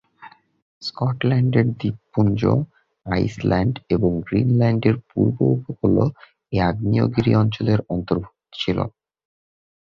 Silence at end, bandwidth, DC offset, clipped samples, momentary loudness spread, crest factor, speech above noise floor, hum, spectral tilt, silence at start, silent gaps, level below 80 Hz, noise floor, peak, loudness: 1 s; 7 kHz; under 0.1%; under 0.1%; 9 LU; 18 dB; 27 dB; none; -8.5 dB/octave; 0.2 s; 0.62-0.81 s; -42 dBFS; -47 dBFS; -2 dBFS; -21 LUFS